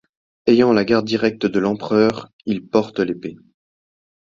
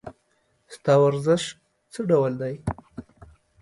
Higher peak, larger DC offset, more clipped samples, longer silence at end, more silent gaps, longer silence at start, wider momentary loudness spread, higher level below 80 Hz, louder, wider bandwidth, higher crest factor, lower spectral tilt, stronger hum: first, -2 dBFS vs -6 dBFS; neither; neither; first, 1 s vs 0.6 s; first, 2.33-2.39 s vs none; first, 0.45 s vs 0.05 s; second, 11 LU vs 23 LU; about the same, -56 dBFS vs -52 dBFS; first, -18 LUFS vs -23 LUFS; second, 7.4 kHz vs 11.5 kHz; about the same, 18 dB vs 18 dB; about the same, -6.5 dB/octave vs -6.5 dB/octave; neither